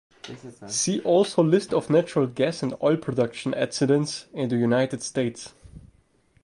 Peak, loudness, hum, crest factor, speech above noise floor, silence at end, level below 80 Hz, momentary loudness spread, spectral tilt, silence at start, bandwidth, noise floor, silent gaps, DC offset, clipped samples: -8 dBFS; -24 LUFS; none; 16 dB; 38 dB; 0.55 s; -60 dBFS; 15 LU; -5 dB/octave; 0.25 s; 11.5 kHz; -62 dBFS; none; under 0.1%; under 0.1%